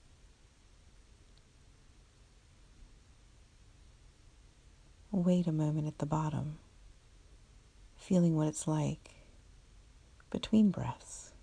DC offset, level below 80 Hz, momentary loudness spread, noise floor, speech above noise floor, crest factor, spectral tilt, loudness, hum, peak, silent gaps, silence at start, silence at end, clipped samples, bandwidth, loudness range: under 0.1%; -60 dBFS; 17 LU; -62 dBFS; 30 dB; 20 dB; -7 dB/octave; -33 LUFS; none; -18 dBFS; none; 2.8 s; 0.15 s; under 0.1%; 10.5 kHz; 4 LU